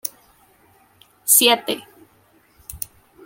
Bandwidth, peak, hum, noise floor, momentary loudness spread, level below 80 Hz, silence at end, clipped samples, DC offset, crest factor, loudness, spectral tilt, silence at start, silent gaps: 17 kHz; -2 dBFS; none; -57 dBFS; 20 LU; -56 dBFS; 0.5 s; under 0.1%; under 0.1%; 22 dB; -16 LUFS; 0 dB/octave; 0.05 s; none